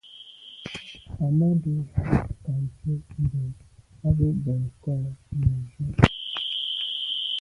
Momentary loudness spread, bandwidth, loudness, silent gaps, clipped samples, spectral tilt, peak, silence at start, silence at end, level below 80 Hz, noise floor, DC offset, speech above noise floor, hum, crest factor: 16 LU; 11 kHz; -26 LUFS; none; under 0.1%; -7 dB/octave; 0 dBFS; 0.05 s; 0 s; -40 dBFS; -46 dBFS; under 0.1%; 22 dB; none; 26 dB